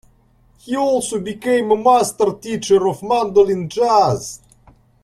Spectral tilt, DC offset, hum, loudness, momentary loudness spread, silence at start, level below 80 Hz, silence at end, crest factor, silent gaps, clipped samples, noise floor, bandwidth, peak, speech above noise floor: -5 dB/octave; under 0.1%; none; -17 LUFS; 11 LU; 0.65 s; -52 dBFS; 0.65 s; 16 dB; none; under 0.1%; -54 dBFS; 13.5 kHz; -2 dBFS; 38 dB